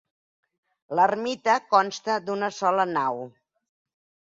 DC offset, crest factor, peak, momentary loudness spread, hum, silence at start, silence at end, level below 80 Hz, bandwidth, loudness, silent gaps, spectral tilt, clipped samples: under 0.1%; 20 dB; -6 dBFS; 8 LU; none; 0.9 s; 1 s; -74 dBFS; 7.8 kHz; -24 LUFS; none; -4 dB/octave; under 0.1%